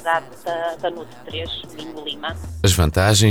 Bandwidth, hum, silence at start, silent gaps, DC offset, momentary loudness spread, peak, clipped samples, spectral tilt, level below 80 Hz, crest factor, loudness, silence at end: 18.5 kHz; none; 0 s; none; 0.6%; 15 LU; -4 dBFS; under 0.1%; -4 dB/octave; -34 dBFS; 16 dB; -22 LUFS; 0 s